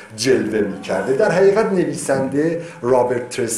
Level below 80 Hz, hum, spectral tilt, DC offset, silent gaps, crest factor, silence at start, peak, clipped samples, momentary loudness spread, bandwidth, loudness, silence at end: -54 dBFS; none; -5 dB/octave; under 0.1%; none; 14 dB; 0 s; -4 dBFS; under 0.1%; 8 LU; 13.5 kHz; -18 LUFS; 0 s